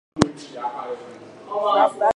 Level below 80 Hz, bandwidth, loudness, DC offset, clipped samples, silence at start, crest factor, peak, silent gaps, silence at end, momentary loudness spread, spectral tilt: -50 dBFS; 11 kHz; -23 LUFS; under 0.1%; under 0.1%; 0.15 s; 22 dB; 0 dBFS; none; 0.05 s; 19 LU; -5 dB/octave